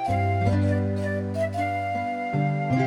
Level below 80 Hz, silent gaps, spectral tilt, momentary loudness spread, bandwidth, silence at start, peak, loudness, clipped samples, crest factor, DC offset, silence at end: -50 dBFS; none; -8 dB/octave; 5 LU; 11 kHz; 0 s; -12 dBFS; -25 LUFS; under 0.1%; 14 dB; under 0.1%; 0 s